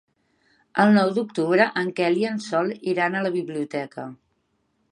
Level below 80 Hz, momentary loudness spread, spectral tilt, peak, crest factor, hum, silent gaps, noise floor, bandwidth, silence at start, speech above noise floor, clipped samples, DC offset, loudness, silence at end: -74 dBFS; 12 LU; -6.5 dB/octave; -4 dBFS; 18 dB; none; none; -70 dBFS; 10.5 kHz; 0.75 s; 48 dB; under 0.1%; under 0.1%; -22 LUFS; 0.75 s